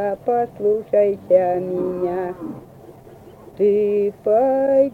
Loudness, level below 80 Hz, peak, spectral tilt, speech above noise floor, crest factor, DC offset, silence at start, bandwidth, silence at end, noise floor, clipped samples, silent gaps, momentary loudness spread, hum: -19 LUFS; -58 dBFS; -4 dBFS; -9 dB/octave; 24 dB; 16 dB; under 0.1%; 0 s; 4.5 kHz; 0 s; -43 dBFS; under 0.1%; none; 10 LU; none